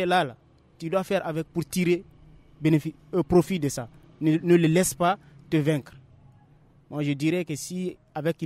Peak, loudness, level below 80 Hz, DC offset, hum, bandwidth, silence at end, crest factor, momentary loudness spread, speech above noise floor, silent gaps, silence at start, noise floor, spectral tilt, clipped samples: -8 dBFS; -26 LUFS; -56 dBFS; under 0.1%; none; 15.5 kHz; 0 s; 18 dB; 11 LU; 32 dB; none; 0 s; -57 dBFS; -6 dB/octave; under 0.1%